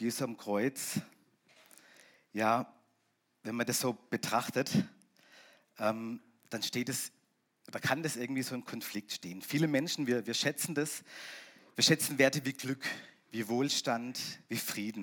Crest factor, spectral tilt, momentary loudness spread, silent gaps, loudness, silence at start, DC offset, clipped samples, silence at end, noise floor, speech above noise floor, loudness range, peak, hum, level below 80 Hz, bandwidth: 24 dB; -3.5 dB/octave; 15 LU; none; -34 LUFS; 0 s; under 0.1%; under 0.1%; 0 s; -77 dBFS; 43 dB; 6 LU; -12 dBFS; none; -86 dBFS; 18 kHz